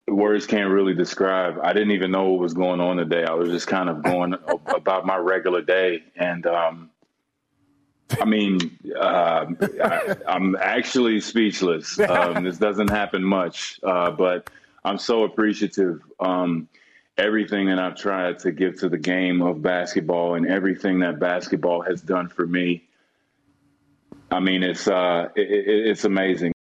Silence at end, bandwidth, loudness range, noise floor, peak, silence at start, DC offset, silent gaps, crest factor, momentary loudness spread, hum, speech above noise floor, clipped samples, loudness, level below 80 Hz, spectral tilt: 0.1 s; 13 kHz; 3 LU; -74 dBFS; -6 dBFS; 0.1 s; under 0.1%; none; 16 dB; 5 LU; none; 52 dB; under 0.1%; -22 LUFS; -58 dBFS; -5.5 dB/octave